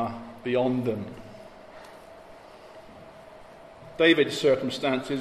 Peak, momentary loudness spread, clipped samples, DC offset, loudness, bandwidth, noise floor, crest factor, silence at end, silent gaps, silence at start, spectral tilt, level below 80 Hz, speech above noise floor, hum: -8 dBFS; 26 LU; under 0.1%; under 0.1%; -25 LUFS; 14 kHz; -48 dBFS; 20 dB; 0 s; none; 0 s; -5 dB/octave; -62 dBFS; 23 dB; none